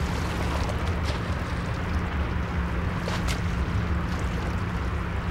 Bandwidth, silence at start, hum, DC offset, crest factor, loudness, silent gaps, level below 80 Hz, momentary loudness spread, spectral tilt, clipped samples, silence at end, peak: 14.5 kHz; 0 s; none; under 0.1%; 14 dB; -28 LUFS; none; -32 dBFS; 2 LU; -6 dB/octave; under 0.1%; 0 s; -14 dBFS